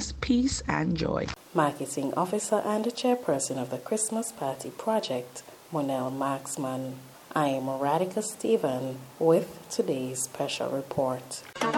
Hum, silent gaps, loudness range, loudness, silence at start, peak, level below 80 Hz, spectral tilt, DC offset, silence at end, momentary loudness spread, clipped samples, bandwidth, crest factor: none; none; 3 LU; -29 LUFS; 0 s; -10 dBFS; -52 dBFS; -4.5 dB/octave; under 0.1%; 0 s; 8 LU; under 0.1%; 17.5 kHz; 20 dB